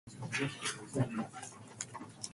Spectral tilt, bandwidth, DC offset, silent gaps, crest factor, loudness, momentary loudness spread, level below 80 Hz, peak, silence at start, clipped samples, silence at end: -4 dB/octave; 11.5 kHz; under 0.1%; none; 22 dB; -39 LUFS; 9 LU; -68 dBFS; -18 dBFS; 0.05 s; under 0.1%; 0 s